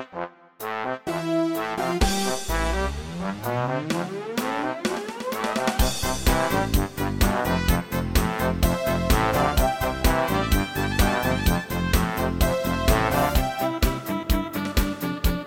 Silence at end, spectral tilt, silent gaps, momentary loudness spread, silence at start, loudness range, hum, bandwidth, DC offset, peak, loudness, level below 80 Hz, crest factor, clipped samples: 0 s; -5 dB/octave; none; 7 LU; 0 s; 4 LU; none; 17 kHz; under 0.1%; -6 dBFS; -24 LUFS; -28 dBFS; 18 dB; under 0.1%